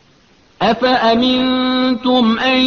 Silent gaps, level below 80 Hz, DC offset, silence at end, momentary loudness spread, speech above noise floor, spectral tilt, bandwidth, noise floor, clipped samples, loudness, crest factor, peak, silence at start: none; -48 dBFS; under 0.1%; 0 s; 3 LU; 37 dB; -5.5 dB/octave; 6.6 kHz; -51 dBFS; under 0.1%; -14 LUFS; 12 dB; -2 dBFS; 0.6 s